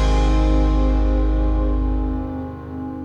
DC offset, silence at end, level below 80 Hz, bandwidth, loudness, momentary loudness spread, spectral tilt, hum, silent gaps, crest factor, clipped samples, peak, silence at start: under 0.1%; 0 s; -18 dBFS; 7.2 kHz; -21 LUFS; 11 LU; -7.5 dB/octave; none; none; 12 dB; under 0.1%; -6 dBFS; 0 s